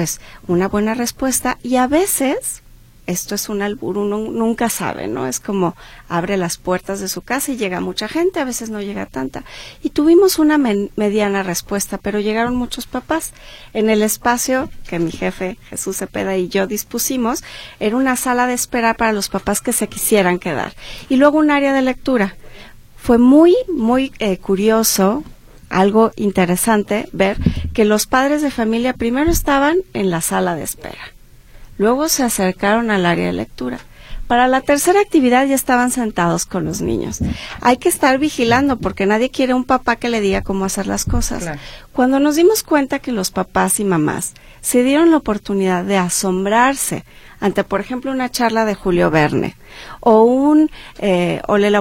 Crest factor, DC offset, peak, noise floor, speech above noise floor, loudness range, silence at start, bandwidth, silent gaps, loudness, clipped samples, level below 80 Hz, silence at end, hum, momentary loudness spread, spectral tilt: 16 dB; under 0.1%; 0 dBFS; -40 dBFS; 23 dB; 5 LU; 0 s; 16.5 kHz; none; -16 LUFS; under 0.1%; -36 dBFS; 0 s; none; 11 LU; -4.5 dB/octave